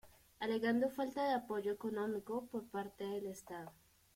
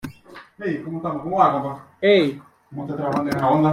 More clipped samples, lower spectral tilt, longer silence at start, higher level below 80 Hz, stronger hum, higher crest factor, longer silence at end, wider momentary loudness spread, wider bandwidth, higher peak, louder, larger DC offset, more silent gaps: neither; second, -5.5 dB/octave vs -7 dB/octave; about the same, 0.05 s vs 0.05 s; second, -76 dBFS vs -60 dBFS; neither; about the same, 16 dB vs 18 dB; first, 0.45 s vs 0 s; second, 12 LU vs 17 LU; about the same, 16.5 kHz vs 16 kHz; second, -24 dBFS vs -2 dBFS; second, -40 LUFS vs -21 LUFS; neither; neither